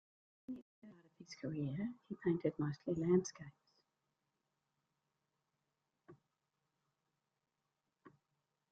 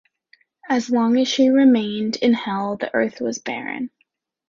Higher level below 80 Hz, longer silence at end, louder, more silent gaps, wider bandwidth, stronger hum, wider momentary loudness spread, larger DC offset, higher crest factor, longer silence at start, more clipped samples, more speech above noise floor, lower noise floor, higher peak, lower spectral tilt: second, -78 dBFS vs -64 dBFS; about the same, 0.6 s vs 0.65 s; second, -40 LUFS vs -20 LUFS; first, 0.62-0.82 s vs none; about the same, 7.4 kHz vs 7.4 kHz; neither; first, 22 LU vs 12 LU; neither; first, 24 dB vs 16 dB; second, 0.5 s vs 0.65 s; neither; about the same, 50 dB vs 49 dB; first, -89 dBFS vs -68 dBFS; second, -22 dBFS vs -6 dBFS; first, -8 dB/octave vs -4.5 dB/octave